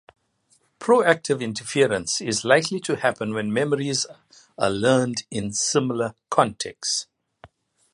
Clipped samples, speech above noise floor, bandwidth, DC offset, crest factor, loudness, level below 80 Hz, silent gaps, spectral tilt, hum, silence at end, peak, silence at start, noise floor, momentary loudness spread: under 0.1%; 42 dB; 11.5 kHz; under 0.1%; 22 dB; -23 LUFS; -60 dBFS; none; -3.5 dB/octave; none; 0.45 s; 0 dBFS; 0.8 s; -65 dBFS; 8 LU